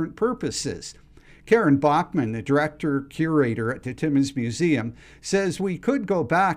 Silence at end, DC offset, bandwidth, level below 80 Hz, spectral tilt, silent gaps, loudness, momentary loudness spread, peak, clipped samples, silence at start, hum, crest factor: 0 s; under 0.1%; 13 kHz; -54 dBFS; -6 dB/octave; none; -23 LUFS; 9 LU; -8 dBFS; under 0.1%; 0 s; none; 16 dB